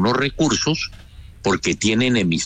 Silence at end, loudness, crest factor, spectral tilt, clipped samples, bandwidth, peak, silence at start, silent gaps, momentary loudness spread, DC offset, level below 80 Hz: 0 s; -20 LUFS; 12 dB; -4 dB/octave; under 0.1%; 9.4 kHz; -8 dBFS; 0 s; none; 7 LU; under 0.1%; -42 dBFS